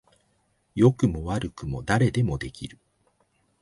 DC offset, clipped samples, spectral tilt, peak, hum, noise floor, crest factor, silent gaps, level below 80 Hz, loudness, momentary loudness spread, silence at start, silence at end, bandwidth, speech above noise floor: under 0.1%; under 0.1%; -7 dB/octave; -6 dBFS; none; -69 dBFS; 20 dB; none; -44 dBFS; -25 LUFS; 16 LU; 0.75 s; 0.95 s; 11.5 kHz; 45 dB